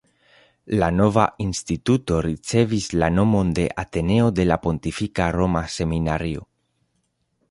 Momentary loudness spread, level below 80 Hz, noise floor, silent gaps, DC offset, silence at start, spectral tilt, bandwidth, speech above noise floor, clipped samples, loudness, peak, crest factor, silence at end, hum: 7 LU; -38 dBFS; -71 dBFS; none; under 0.1%; 0.65 s; -6.5 dB/octave; 11.5 kHz; 50 dB; under 0.1%; -21 LUFS; -2 dBFS; 20 dB; 1.05 s; none